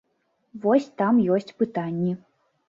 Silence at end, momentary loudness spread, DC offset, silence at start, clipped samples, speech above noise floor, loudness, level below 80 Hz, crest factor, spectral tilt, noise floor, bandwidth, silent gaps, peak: 0.5 s; 8 LU; under 0.1%; 0.55 s; under 0.1%; 49 dB; -24 LUFS; -68 dBFS; 16 dB; -8.5 dB/octave; -71 dBFS; 7.4 kHz; none; -8 dBFS